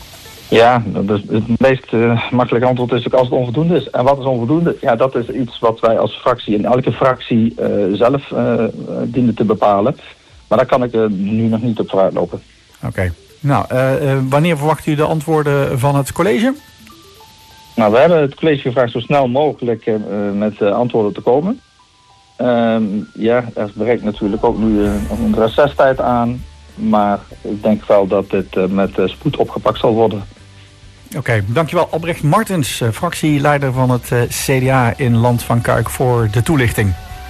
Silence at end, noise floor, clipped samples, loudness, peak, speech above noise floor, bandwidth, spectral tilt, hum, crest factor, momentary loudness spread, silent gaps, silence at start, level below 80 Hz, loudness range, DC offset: 0 s; -49 dBFS; under 0.1%; -15 LUFS; -2 dBFS; 34 dB; 14 kHz; -6.5 dB/octave; none; 12 dB; 7 LU; none; 0 s; -38 dBFS; 3 LU; under 0.1%